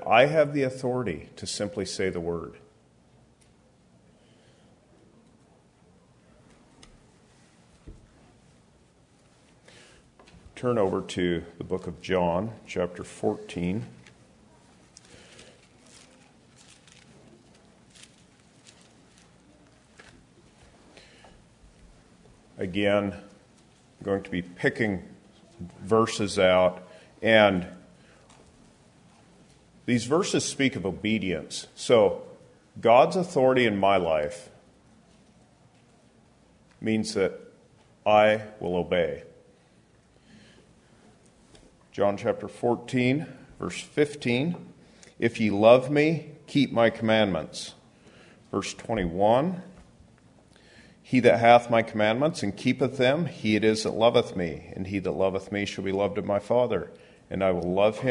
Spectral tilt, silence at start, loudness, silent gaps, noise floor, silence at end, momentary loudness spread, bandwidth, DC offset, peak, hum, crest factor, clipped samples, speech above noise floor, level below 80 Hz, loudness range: -5.5 dB/octave; 0 s; -25 LUFS; none; -60 dBFS; 0 s; 15 LU; 11 kHz; under 0.1%; -4 dBFS; none; 24 dB; under 0.1%; 35 dB; -60 dBFS; 11 LU